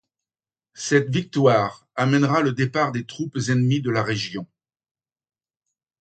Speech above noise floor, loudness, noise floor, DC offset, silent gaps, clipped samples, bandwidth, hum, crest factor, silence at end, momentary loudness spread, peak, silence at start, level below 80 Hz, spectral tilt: over 69 dB; -22 LUFS; under -90 dBFS; under 0.1%; none; under 0.1%; 9 kHz; none; 20 dB; 1.55 s; 11 LU; -4 dBFS; 0.75 s; -60 dBFS; -6 dB/octave